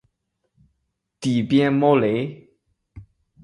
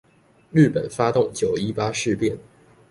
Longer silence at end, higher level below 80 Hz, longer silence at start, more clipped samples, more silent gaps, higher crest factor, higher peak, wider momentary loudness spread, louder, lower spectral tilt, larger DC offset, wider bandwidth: about the same, 0.4 s vs 0.5 s; about the same, -58 dBFS vs -54 dBFS; first, 1.2 s vs 0.55 s; neither; neither; about the same, 20 dB vs 18 dB; about the same, -4 dBFS vs -4 dBFS; first, 11 LU vs 6 LU; about the same, -20 LUFS vs -22 LUFS; about the same, -7 dB/octave vs -6 dB/octave; neither; about the same, 11 kHz vs 11.5 kHz